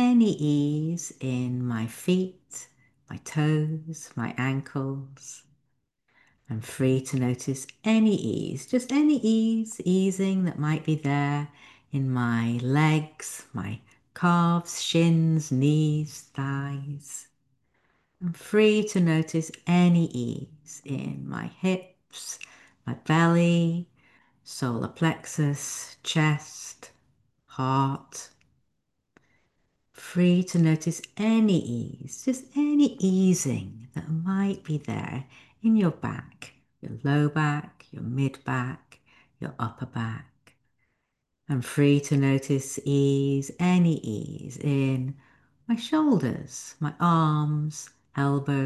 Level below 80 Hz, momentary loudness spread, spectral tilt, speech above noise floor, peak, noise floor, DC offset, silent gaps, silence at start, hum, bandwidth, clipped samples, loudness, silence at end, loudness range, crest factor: -64 dBFS; 17 LU; -6 dB/octave; 54 dB; -8 dBFS; -79 dBFS; under 0.1%; none; 0 s; none; 12.5 kHz; under 0.1%; -26 LUFS; 0 s; 6 LU; 18 dB